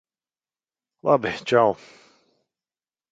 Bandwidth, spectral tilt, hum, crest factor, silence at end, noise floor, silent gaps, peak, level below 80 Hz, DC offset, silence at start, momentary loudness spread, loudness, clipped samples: 8.6 kHz; -6 dB/octave; none; 22 dB; 1.4 s; under -90 dBFS; none; -4 dBFS; -64 dBFS; under 0.1%; 1.05 s; 10 LU; -22 LUFS; under 0.1%